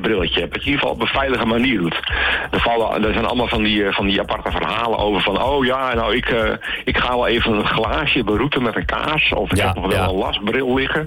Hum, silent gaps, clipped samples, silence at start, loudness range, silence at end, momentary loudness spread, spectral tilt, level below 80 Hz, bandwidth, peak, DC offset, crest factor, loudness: none; none; under 0.1%; 0 s; 1 LU; 0 s; 3 LU; -5.5 dB/octave; -34 dBFS; 17.5 kHz; -8 dBFS; under 0.1%; 10 dB; -18 LUFS